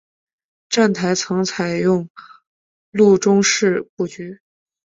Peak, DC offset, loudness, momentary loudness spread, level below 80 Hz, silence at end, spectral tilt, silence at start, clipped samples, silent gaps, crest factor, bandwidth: -2 dBFS; under 0.1%; -17 LUFS; 14 LU; -60 dBFS; 0.5 s; -4.5 dB/octave; 0.7 s; under 0.1%; 2.10-2.15 s, 2.47-2.92 s, 3.89-3.97 s; 16 dB; 7.8 kHz